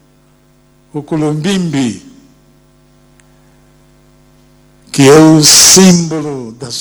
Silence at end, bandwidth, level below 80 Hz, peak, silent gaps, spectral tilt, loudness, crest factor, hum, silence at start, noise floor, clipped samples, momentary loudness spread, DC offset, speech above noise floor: 0 s; over 20 kHz; -46 dBFS; 0 dBFS; none; -3.5 dB/octave; -7 LUFS; 12 dB; none; 0.95 s; -48 dBFS; 0.8%; 21 LU; under 0.1%; 40 dB